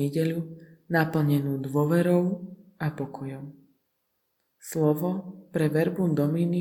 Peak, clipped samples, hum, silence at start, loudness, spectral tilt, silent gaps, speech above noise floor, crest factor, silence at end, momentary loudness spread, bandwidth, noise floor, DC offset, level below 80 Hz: -8 dBFS; under 0.1%; none; 0 s; -26 LUFS; -7.5 dB/octave; none; 51 dB; 18 dB; 0 s; 14 LU; 19 kHz; -76 dBFS; under 0.1%; -66 dBFS